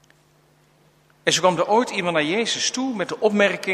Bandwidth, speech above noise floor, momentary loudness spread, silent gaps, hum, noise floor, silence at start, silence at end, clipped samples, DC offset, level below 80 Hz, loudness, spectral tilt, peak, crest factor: 15 kHz; 37 dB; 6 LU; none; none; -58 dBFS; 1.25 s; 0 s; under 0.1%; under 0.1%; -68 dBFS; -21 LUFS; -3 dB/octave; -2 dBFS; 20 dB